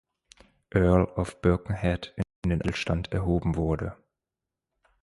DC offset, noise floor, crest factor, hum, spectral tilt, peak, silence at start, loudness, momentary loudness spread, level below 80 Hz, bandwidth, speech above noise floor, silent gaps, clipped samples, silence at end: under 0.1%; -88 dBFS; 20 dB; none; -7.5 dB/octave; -8 dBFS; 0.75 s; -27 LUFS; 9 LU; -38 dBFS; 11.5 kHz; 62 dB; 2.36-2.42 s; under 0.1%; 1.1 s